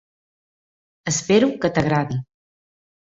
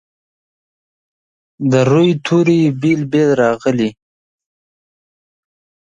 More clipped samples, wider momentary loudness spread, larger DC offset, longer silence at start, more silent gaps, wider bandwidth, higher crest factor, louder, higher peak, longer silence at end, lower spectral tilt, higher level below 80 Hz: neither; first, 12 LU vs 6 LU; neither; second, 1.05 s vs 1.6 s; neither; about the same, 8.2 kHz vs 9 kHz; about the same, 20 dB vs 16 dB; second, -20 LUFS vs -14 LUFS; second, -4 dBFS vs 0 dBFS; second, 0.8 s vs 2 s; second, -5 dB/octave vs -7 dB/octave; about the same, -52 dBFS vs -56 dBFS